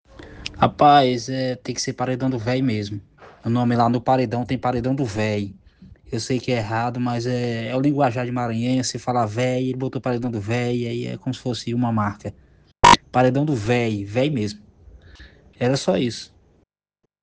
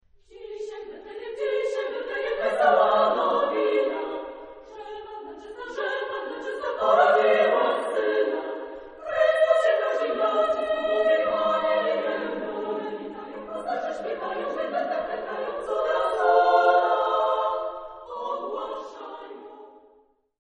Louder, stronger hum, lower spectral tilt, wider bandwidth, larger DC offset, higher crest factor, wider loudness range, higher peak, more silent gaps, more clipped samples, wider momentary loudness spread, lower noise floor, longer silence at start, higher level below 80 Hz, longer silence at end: first, -21 LUFS vs -24 LUFS; neither; first, -5.5 dB/octave vs -4 dB/octave; about the same, 9.8 kHz vs 10 kHz; neither; about the same, 22 dB vs 18 dB; about the same, 5 LU vs 7 LU; first, 0 dBFS vs -6 dBFS; neither; neither; second, 12 LU vs 19 LU; first, -76 dBFS vs -61 dBFS; second, 0.2 s vs 0.35 s; first, -48 dBFS vs -64 dBFS; first, 0.95 s vs 0.8 s